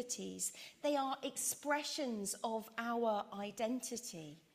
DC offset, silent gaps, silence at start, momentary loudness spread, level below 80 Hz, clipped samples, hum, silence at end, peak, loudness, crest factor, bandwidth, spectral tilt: under 0.1%; none; 0 s; 7 LU; -84 dBFS; under 0.1%; none; 0.15 s; -24 dBFS; -40 LUFS; 16 dB; 15.5 kHz; -2.5 dB/octave